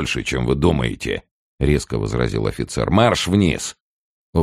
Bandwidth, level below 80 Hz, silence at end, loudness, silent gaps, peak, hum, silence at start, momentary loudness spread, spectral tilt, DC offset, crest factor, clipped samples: 13 kHz; -32 dBFS; 0 s; -20 LUFS; 1.31-1.58 s, 3.80-4.33 s; -2 dBFS; none; 0 s; 10 LU; -5.5 dB/octave; under 0.1%; 18 dB; under 0.1%